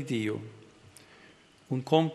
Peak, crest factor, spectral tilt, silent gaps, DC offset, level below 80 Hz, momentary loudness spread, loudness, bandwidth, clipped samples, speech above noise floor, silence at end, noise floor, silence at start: -8 dBFS; 24 dB; -6.5 dB/octave; none; under 0.1%; -74 dBFS; 27 LU; -31 LUFS; 12.5 kHz; under 0.1%; 29 dB; 0 s; -58 dBFS; 0 s